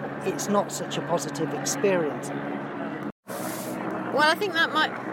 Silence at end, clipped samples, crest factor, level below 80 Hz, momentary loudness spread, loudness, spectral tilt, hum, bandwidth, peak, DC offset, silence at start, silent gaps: 0 s; under 0.1%; 18 dB; -68 dBFS; 11 LU; -27 LUFS; -3.5 dB/octave; none; 17 kHz; -8 dBFS; under 0.1%; 0 s; 3.12-3.23 s